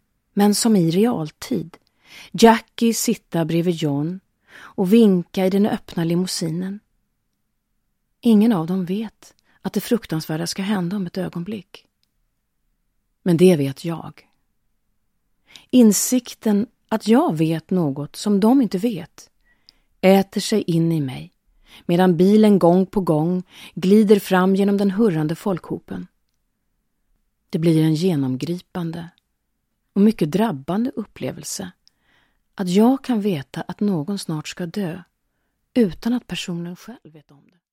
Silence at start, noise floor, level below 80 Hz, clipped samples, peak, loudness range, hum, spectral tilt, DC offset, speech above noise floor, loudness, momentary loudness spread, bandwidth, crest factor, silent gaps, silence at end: 0.35 s; -72 dBFS; -56 dBFS; under 0.1%; 0 dBFS; 7 LU; none; -6 dB/octave; under 0.1%; 53 dB; -20 LUFS; 15 LU; 16.5 kHz; 20 dB; none; 0.75 s